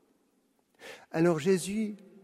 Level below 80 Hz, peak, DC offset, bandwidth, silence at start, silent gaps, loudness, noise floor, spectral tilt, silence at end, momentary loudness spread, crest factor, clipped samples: -70 dBFS; -14 dBFS; under 0.1%; 14.5 kHz; 0.8 s; none; -29 LUFS; -72 dBFS; -6 dB/octave; 0.3 s; 20 LU; 18 dB; under 0.1%